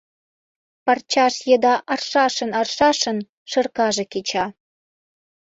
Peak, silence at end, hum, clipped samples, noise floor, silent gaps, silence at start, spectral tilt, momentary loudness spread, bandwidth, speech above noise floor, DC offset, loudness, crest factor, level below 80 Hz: -4 dBFS; 0.95 s; none; under 0.1%; under -90 dBFS; 3.29-3.46 s; 0.85 s; -2.5 dB/octave; 8 LU; 8 kHz; over 71 dB; under 0.1%; -20 LUFS; 18 dB; -62 dBFS